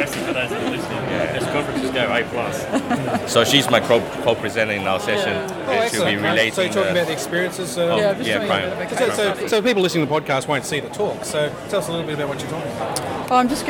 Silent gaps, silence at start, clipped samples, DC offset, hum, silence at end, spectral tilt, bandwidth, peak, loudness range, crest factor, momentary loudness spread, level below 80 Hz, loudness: none; 0 s; under 0.1%; under 0.1%; none; 0 s; -4 dB/octave; 18.5 kHz; -2 dBFS; 3 LU; 20 dB; 7 LU; -52 dBFS; -20 LUFS